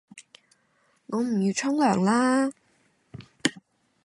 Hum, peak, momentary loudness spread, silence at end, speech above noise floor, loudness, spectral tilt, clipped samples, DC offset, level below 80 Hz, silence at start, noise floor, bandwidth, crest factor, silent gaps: none; -6 dBFS; 11 LU; 0.45 s; 44 dB; -25 LUFS; -5 dB/octave; under 0.1%; under 0.1%; -70 dBFS; 0.15 s; -67 dBFS; 11.5 kHz; 22 dB; none